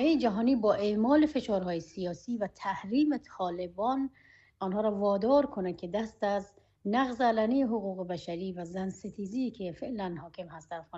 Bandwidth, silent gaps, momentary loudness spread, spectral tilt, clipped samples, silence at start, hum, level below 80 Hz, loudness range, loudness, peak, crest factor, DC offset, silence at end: 8 kHz; none; 12 LU; -7 dB/octave; under 0.1%; 0 s; none; -62 dBFS; 4 LU; -31 LUFS; -14 dBFS; 18 dB; under 0.1%; 0 s